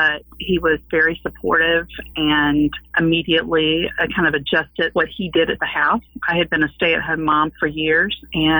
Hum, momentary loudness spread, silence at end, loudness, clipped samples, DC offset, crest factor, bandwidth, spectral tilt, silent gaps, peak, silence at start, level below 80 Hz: none; 5 LU; 0 s; -18 LUFS; under 0.1%; under 0.1%; 12 dB; over 20 kHz; -7.5 dB/octave; none; -6 dBFS; 0 s; -42 dBFS